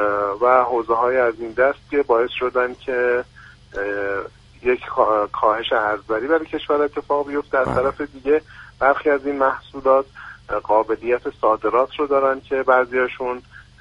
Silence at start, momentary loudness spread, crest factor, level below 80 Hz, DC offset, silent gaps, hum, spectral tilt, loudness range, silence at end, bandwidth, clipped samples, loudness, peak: 0 s; 9 LU; 18 dB; -50 dBFS; under 0.1%; none; none; -6.5 dB/octave; 2 LU; 0.2 s; 7.4 kHz; under 0.1%; -20 LUFS; -2 dBFS